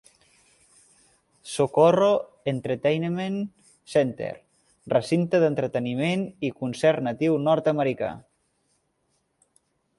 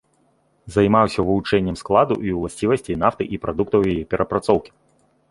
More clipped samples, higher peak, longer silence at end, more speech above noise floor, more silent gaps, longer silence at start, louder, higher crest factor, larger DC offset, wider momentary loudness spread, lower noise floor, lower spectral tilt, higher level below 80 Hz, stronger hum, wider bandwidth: neither; second, -6 dBFS vs 0 dBFS; first, 1.8 s vs 0.65 s; first, 49 dB vs 43 dB; neither; first, 1.45 s vs 0.65 s; second, -24 LUFS vs -20 LUFS; about the same, 20 dB vs 20 dB; neither; first, 13 LU vs 7 LU; first, -72 dBFS vs -62 dBFS; about the same, -6.5 dB/octave vs -7 dB/octave; second, -66 dBFS vs -44 dBFS; neither; about the same, 11.5 kHz vs 11.5 kHz